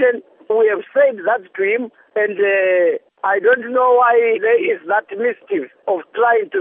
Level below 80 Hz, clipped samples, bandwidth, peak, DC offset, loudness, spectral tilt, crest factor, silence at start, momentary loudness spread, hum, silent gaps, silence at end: -82 dBFS; under 0.1%; 3.7 kHz; -2 dBFS; under 0.1%; -17 LUFS; -1.5 dB/octave; 14 dB; 0 s; 9 LU; none; none; 0 s